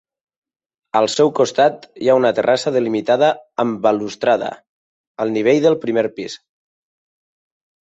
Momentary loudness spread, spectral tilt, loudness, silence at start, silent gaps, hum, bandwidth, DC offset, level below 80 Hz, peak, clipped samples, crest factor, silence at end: 8 LU; -5 dB/octave; -17 LUFS; 0.95 s; 4.69-5.15 s; none; 8.2 kHz; under 0.1%; -64 dBFS; -2 dBFS; under 0.1%; 16 dB; 1.45 s